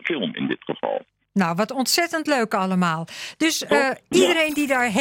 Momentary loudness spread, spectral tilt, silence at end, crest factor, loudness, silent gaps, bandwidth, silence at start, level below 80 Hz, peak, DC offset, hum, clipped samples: 9 LU; -4 dB/octave; 0 s; 16 dB; -21 LUFS; none; 17 kHz; 0.05 s; -64 dBFS; -4 dBFS; under 0.1%; none; under 0.1%